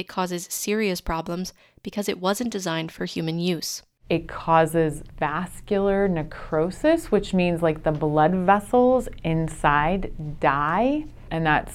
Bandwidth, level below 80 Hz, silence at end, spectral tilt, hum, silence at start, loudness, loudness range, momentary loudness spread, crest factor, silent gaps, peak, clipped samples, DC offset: 16 kHz; -40 dBFS; 0 s; -5.5 dB/octave; none; 0 s; -24 LUFS; 6 LU; 10 LU; 20 dB; none; -4 dBFS; under 0.1%; under 0.1%